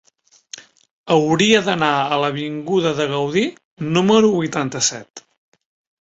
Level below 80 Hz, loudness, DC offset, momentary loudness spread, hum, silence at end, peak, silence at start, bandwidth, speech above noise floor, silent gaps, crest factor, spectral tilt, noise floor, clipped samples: -58 dBFS; -18 LUFS; under 0.1%; 18 LU; none; 0.85 s; 0 dBFS; 0.55 s; 8 kHz; 26 dB; 0.91-1.04 s, 3.65-3.77 s, 5.10-5.14 s; 20 dB; -4 dB/octave; -43 dBFS; under 0.1%